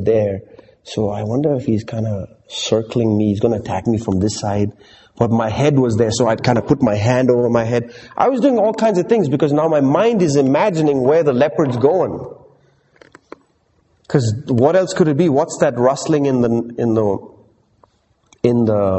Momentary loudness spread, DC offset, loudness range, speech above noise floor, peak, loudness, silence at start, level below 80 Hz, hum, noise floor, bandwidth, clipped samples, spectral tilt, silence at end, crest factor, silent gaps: 8 LU; under 0.1%; 5 LU; 44 dB; 0 dBFS; -16 LUFS; 0 s; -46 dBFS; none; -59 dBFS; 8.6 kHz; under 0.1%; -6.5 dB/octave; 0 s; 16 dB; none